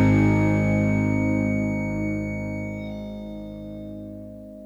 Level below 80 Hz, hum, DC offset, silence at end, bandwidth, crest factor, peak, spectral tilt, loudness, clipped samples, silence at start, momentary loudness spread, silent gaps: -40 dBFS; none; under 0.1%; 0 s; 12 kHz; 14 dB; -8 dBFS; -8.5 dB/octave; -24 LUFS; under 0.1%; 0 s; 17 LU; none